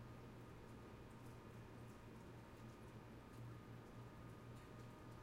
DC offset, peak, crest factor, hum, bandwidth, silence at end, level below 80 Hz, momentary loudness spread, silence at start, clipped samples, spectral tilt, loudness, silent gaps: under 0.1%; -46 dBFS; 12 dB; none; 16 kHz; 0 s; -68 dBFS; 2 LU; 0 s; under 0.1%; -6.5 dB/octave; -59 LUFS; none